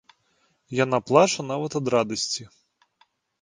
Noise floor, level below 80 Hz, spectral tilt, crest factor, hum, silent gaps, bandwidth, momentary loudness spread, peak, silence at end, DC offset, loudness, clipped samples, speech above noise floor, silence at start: -68 dBFS; -66 dBFS; -4 dB/octave; 24 dB; none; none; 10 kHz; 9 LU; -2 dBFS; 0.95 s; under 0.1%; -23 LUFS; under 0.1%; 45 dB; 0.7 s